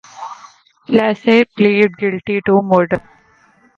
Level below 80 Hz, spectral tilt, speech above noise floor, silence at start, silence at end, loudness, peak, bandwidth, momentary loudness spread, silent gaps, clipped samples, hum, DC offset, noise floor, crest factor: -54 dBFS; -7 dB/octave; 38 dB; 0.15 s; 0.8 s; -14 LUFS; 0 dBFS; 7.2 kHz; 14 LU; none; under 0.1%; none; under 0.1%; -52 dBFS; 16 dB